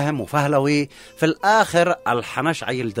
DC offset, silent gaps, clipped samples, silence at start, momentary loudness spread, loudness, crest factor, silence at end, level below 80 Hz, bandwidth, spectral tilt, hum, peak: under 0.1%; none; under 0.1%; 0 s; 7 LU; -20 LUFS; 16 dB; 0 s; -56 dBFS; 16 kHz; -5.5 dB/octave; none; -4 dBFS